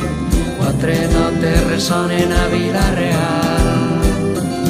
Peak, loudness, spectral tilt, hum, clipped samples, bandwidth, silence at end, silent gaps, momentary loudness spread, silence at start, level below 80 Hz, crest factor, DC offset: -2 dBFS; -16 LUFS; -5.5 dB/octave; none; under 0.1%; 15.5 kHz; 0 s; none; 3 LU; 0 s; -22 dBFS; 14 dB; under 0.1%